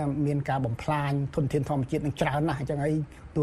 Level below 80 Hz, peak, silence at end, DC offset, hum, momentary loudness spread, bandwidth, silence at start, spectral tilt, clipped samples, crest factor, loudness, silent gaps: -48 dBFS; -10 dBFS; 0 s; under 0.1%; none; 2 LU; 12.5 kHz; 0 s; -7.5 dB/octave; under 0.1%; 16 dB; -28 LUFS; none